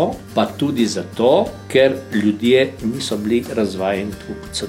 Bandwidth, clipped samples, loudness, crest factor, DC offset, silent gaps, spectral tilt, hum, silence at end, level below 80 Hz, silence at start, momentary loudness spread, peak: 16.5 kHz; under 0.1%; -18 LUFS; 14 dB; under 0.1%; none; -5 dB/octave; none; 0 s; -46 dBFS; 0 s; 8 LU; -4 dBFS